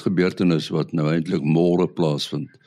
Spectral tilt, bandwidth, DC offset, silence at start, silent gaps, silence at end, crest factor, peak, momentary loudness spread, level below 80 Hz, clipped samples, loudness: -7 dB/octave; 11.5 kHz; under 0.1%; 0 s; none; 0.2 s; 14 dB; -6 dBFS; 5 LU; -60 dBFS; under 0.1%; -21 LUFS